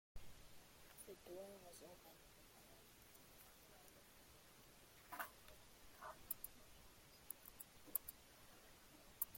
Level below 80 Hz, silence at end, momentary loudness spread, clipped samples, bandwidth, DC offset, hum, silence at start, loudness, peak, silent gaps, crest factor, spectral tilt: -72 dBFS; 0 s; 16 LU; under 0.1%; 16.5 kHz; under 0.1%; none; 0.15 s; -57 LUFS; -20 dBFS; none; 38 dB; -2 dB/octave